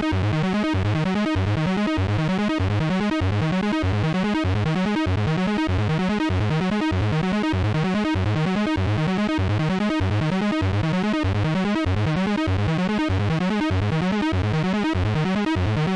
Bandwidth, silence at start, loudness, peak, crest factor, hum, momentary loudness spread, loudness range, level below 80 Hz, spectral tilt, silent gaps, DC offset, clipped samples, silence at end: 10.5 kHz; 0 s; -22 LUFS; -16 dBFS; 6 dB; none; 0 LU; 0 LU; -40 dBFS; -7 dB/octave; none; under 0.1%; under 0.1%; 0 s